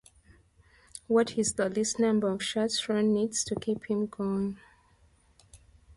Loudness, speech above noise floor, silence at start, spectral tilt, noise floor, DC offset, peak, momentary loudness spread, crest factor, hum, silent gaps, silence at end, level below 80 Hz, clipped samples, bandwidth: -29 LUFS; 35 dB; 0.95 s; -4 dB/octave; -63 dBFS; under 0.1%; -14 dBFS; 7 LU; 16 dB; none; none; 0.05 s; -62 dBFS; under 0.1%; 11.5 kHz